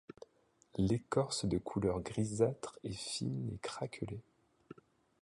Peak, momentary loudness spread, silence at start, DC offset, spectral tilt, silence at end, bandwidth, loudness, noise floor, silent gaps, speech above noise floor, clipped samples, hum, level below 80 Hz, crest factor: -18 dBFS; 22 LU; 0.75 s; under 0.1%; -5.5 dB/octave; 0.5 s; 11.5 kHz; -38 LUFS; -71 dBFS; none; 35 dB; under 0.1%; none; -58 dBFS; 20 dB